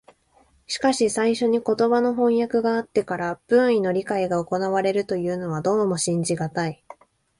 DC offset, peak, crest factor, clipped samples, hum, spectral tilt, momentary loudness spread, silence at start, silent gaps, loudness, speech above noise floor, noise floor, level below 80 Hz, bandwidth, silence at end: under 0.1%; -6 dBFS; 16 dB; under 0.1%; none; -5 dB/octave; 7 LU; 0.7 s; none; -22 LUFS; 38 dB; -60 dBFS; -60 dBFS; 11.5 kHz; 0.45 s